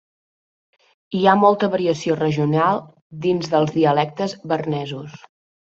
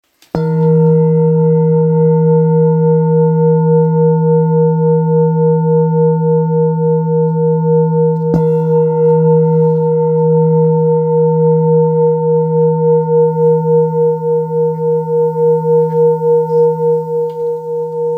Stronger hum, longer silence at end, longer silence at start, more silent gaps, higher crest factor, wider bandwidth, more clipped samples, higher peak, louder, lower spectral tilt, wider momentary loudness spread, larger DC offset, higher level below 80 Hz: neither; first, 0.6 s vs 0 s; first, 1.1 s vs 0.35 s; first, 3.02-3.10 s vs none; first, 18 dB vs 10 dB; first, 7.8 kHz vs 2.2 kHz; neither; about the same, -2 dBFS vs 0 dBFS; second, -19 LUFS vs -12 LUFS; second, -6.5 dB/octave vs -12.5 dB/octave; first, 11 LU vs 4 LU; neither; second, -62 dBFS vs -54 dBFS